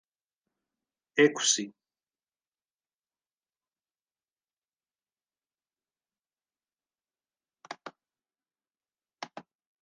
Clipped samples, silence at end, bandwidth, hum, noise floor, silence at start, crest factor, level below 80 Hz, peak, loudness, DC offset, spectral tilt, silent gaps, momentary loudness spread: under 0.1%; 0.4 s; 9.6 kHz; none; under -90 dBFS; 1.15 s; 28 dB; under -90 dBFS; -10 dBFS; -26 LUFS; under 0.1%; -2 dB/octave; 2.48-2.52 s, 2.74-2.79 s, 2.95-3.00 s, 4.53-4.57 s; 22 LU